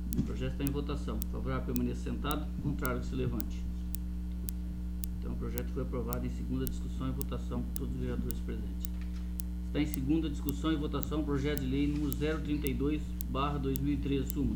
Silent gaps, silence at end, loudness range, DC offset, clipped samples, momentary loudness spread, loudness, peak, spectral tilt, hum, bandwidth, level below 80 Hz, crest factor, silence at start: none; 0 s; 4 LU; under 0.1%; under 0.1%; 6 LU; -35 LUFS; -6 dBFS; -6.5 dB/octave; none; over 20 kHz; -38 dBFS; 26 dB; 0 s